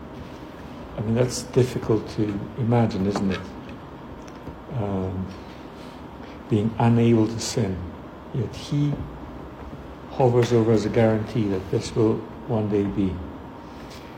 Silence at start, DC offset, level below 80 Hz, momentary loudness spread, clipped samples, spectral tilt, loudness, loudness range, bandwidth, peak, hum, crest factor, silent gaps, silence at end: 0 s; under 0.1%; -46 dBFS; 19 LU; under 0.1%; -7 dB/octave; -24 LUFS; 6 LU; 12.5 kHz; -6 dBFS; none; 18 dB; none; 0 s